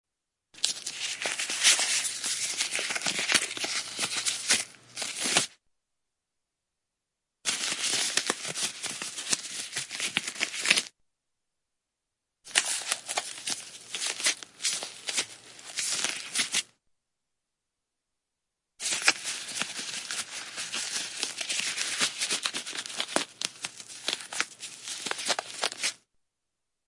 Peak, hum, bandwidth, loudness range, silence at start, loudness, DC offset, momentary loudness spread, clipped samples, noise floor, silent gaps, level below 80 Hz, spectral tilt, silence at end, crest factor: -2 dBFS; none; 11.5 kHz; 6 LU; 0.55 s; -29 LUFS; under 0.1%; 10 LU; under 0.1%; -85 dBFS; none; -80 dBFS; 1 dB/octave; 0.9 s; 32 dB